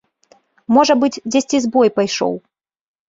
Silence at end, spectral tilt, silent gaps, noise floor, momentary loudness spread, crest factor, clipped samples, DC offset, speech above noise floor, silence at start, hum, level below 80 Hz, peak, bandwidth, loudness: 0.7 s; -4 dB/octave; none; -55 dBFS; 9 LU; 16 dB; under 0.1%; under 0.1%; 40 dB; 0.7 s; none; -62 dBFS; -2 dBFS; 7.8 kHz; -16 LUFS